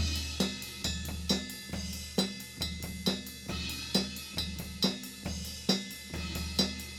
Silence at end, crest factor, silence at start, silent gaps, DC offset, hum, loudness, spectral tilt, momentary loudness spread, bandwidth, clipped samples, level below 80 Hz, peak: 0 s; 22 dB; 0 s; none; under 0.1%; none; -34 LUFS; -3.5 dB/octave; 7 LU; 19.5 kHz; under 0.1%; -48 dBFS; -12 dBFS